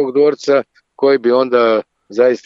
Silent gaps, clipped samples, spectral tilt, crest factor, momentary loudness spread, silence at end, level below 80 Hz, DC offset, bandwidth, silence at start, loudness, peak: none; under 0.1%; -5.5 dB/octave; 12 dB; 5 LU; 0.1 s; -68 dBFS; under 0.1%; 7.6 kHz; 0 s; -14 LUFS; -2 dBFS